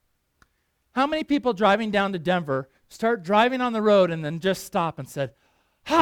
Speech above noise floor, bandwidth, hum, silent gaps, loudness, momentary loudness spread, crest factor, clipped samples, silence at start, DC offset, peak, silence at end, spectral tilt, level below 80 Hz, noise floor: 48 dB; 18 kHz; none; none; -24 LUFS; 12 LU; 18 dB; under 0.1%; 0.95 s; under 0.1%; -4 dBFS; 0 s; -5.5 dB/octave; -60 dBFS; -71 dBFS